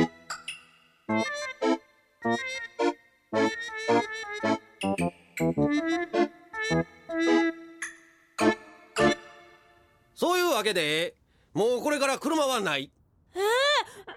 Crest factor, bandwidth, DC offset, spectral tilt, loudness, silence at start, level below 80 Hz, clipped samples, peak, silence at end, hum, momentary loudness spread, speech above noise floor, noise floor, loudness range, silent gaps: 18 dB; 16 kHz; under 0.1%; -4 dB/octave; -28 LUFS; 0 s; -60 dBFS; under 0.1%; -12 dBFS; 0 s; none; 13 LU; 34 dB; -61 dBFS; 3 LU; none